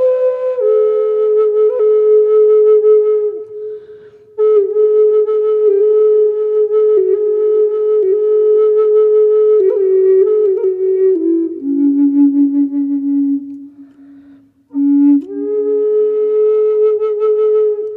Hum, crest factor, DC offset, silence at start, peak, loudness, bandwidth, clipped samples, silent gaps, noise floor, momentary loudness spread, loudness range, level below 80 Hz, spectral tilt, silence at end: none; 8 dB; under 0.1%; 0 s; -4 dBFS; -12 LUFS; 3.2 kHz; under 0.1%; none; -44 dBFS; 7 LU; 4 LU; -72 dBFS; -9 dB/octave; 0 s